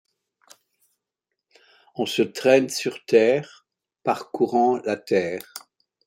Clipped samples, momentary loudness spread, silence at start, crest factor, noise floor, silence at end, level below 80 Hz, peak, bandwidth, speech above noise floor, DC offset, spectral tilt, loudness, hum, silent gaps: under 0.1%; 17 LU; 1.95 s; 20 dB; -83 dBFS; 0.5 s; -74 dBFS; -4 dBFS; 16.5 kHz; 62 dB; under 0.1%; -4.5 dB/octave; -22 LUFS; none; none